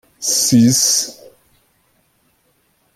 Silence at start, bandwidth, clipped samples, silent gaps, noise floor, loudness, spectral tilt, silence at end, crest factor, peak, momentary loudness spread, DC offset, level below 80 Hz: 0.2 s; 16 kHz; under 0.1%; none; -61 dBFS; -13 LUFS; -3 dB/octave; 1.85 s; 16 dB; -2 dBFS; 6 LU; under 0.1%; -60 dBFS